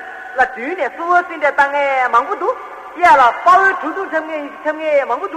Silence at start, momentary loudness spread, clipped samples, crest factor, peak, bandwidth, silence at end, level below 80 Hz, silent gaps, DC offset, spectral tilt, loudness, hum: 0 s; 12 LU; under 0.1%; 14 dB; -2 dBFS; 11.5 kHz; 0 s; -54 dBFS; none; under 0.1%; -3 dB/octave; -15 LUFS; none